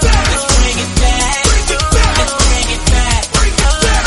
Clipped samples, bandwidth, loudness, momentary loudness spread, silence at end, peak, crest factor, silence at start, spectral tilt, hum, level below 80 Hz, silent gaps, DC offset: under 0.1%; 12 kHz; -12 LUFS; 2 LU; 0 s; 0 dBFS; 12 dB; 0 s; -3 dB/octave; none; -14 dBFS; none; under 0.1%